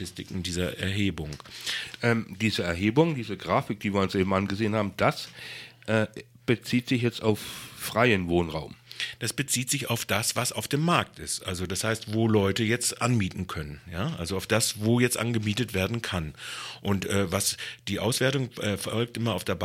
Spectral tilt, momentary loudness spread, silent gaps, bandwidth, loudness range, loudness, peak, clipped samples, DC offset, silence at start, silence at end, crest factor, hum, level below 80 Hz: -4.5 dB/octave; 11 LU; none; 16.5 kHz; 2 LU; -27 LUFS; -4 dBFS; under 0.1%; under 0.1%; 0 s; 0 s; 22 dB; none; -54 dBFS